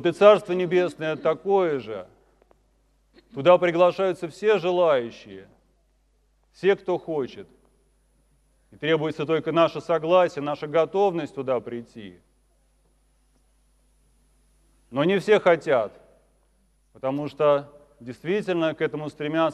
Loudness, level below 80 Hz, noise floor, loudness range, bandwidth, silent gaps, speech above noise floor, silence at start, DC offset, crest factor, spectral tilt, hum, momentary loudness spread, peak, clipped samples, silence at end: -23 LUFS; -64 dBFS; -65 dBFS; 8 LU; 11 kHz; none; 42 dB; 0 s; under 0.1%; 22 dB; -6.5 dB/octave; none; 17 LU; -2 dBFS; under 0.1%; 0 s